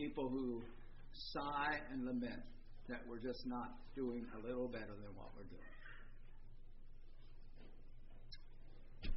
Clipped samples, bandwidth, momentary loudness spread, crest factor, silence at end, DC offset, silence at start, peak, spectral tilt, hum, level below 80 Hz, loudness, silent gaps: under 0.1%; 5.6 kHz; 23 LU; 18 dB; 0 s; under 0.1%; 0 s; -28 dBFS; -4 dB/octave; none; -54 dBFS; -46 LUFS; none